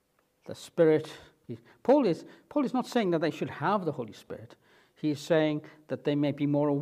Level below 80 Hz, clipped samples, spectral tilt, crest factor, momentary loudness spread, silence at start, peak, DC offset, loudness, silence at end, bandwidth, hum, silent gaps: -74 dBFS; under 0.1%; -7 dB/octave; 18 dB; 20 LU; 0.5 s; -10 dBFS; under 0.1%; -29 LUFS; 0 s; 14 kHz; none; none